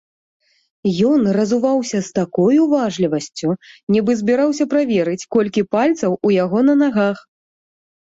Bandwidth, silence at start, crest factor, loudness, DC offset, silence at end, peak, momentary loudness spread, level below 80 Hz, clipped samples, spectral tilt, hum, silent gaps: 8 kHz; 0.85 s; 14 dB; -17 LUFS; under 0.1%; 0.95 s; -4 dBFS; 7 LU; -60 dBFS; under 0.1%; -6.5 dB/octave; none; 3.83-3.87 s